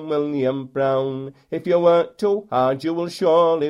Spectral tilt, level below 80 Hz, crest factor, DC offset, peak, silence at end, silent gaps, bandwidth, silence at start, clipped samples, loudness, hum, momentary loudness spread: -7 dB/octave; -64 dBFS; 14 dB; under 0.1%; -4 dBFS; 0 s; none; 11 kHz; 0 s; under 0.1%; -20 LUFS; none; 11 LU